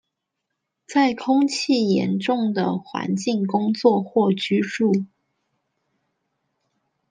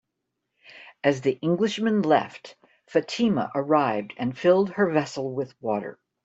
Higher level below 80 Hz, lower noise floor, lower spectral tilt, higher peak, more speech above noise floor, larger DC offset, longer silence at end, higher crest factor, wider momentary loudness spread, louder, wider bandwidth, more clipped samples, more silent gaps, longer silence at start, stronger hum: about the same, -72 dBFS vs -68 dBFS; about the same, -80 dBFS vs -81 dBFS; about the same, -6 dB/octave vs -6 dB/octave; about the same, -4 dBFS vs -6 dBFS; about the same, 60 dB vs 57 dB; neither; first, 2.05 s vs 0.3 s; about the same, 18 dB vs 20 dB; second, 6 LU vs 10 LU; first, -21 LUFS vs -24 LUFS; first, 9.6 kHz vs 8 kHz; neither; neither; first, 0.9 s vs 0.75 s; neither